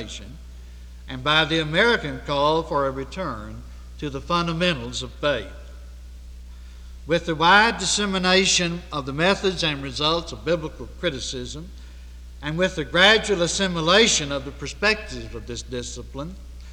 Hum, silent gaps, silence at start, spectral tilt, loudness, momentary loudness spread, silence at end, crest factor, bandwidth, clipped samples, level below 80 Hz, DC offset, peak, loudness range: 60 Hz at -40 dBFS; none; 0 s; -3 dB/octave; -21 LUFS; 23 LU; 0 s; 20 dB; 17.5 kHz; under 0.1%; -40 dBFS; under 0.1%; -4 dBFS; 7 LU